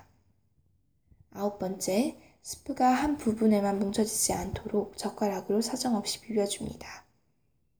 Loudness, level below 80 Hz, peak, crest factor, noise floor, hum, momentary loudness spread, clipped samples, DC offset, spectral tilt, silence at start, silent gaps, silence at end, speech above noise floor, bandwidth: -29 LUFS; -56 dBFS; -12 dBFS; 18 dB; -74 dBFS; none; 15 LU; under 0.1%; under 0.1%; -4 dB/octave; 1.35 s; none; 0.8 s; 45 dB; over 20 kHz